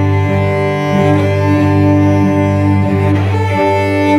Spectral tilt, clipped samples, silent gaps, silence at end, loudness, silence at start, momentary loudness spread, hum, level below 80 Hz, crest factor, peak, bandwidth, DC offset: -8 dB/octave; under 0.1%; none; 0 s; -12 LUFS; 0 s; 3 LU; none; -44 dBFS; 10 dB; 0 dBFS; 10.5 kHz; under 0.1%